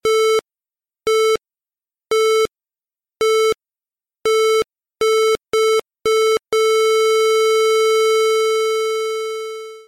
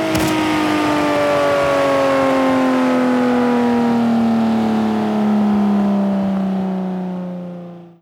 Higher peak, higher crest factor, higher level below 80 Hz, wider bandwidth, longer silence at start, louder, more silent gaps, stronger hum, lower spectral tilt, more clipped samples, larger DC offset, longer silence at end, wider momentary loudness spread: second, -12 dBFS vs -4 dBFS; second, 6 dB vs 12 dB; second, -58 dBFS vs -48 dBFS; about the same, 16.5 kHz vs 17 kHz; about the same, 0.05 s vs 0 s; about the same, -17 LUFS vs -16 LUFS; neither; neither; second, -0.5 dB/octave vs -6 dB/octave; neither; neither; about the same, 0.05 s vs 0.15 s; about the same, 9 LU vs 8 LU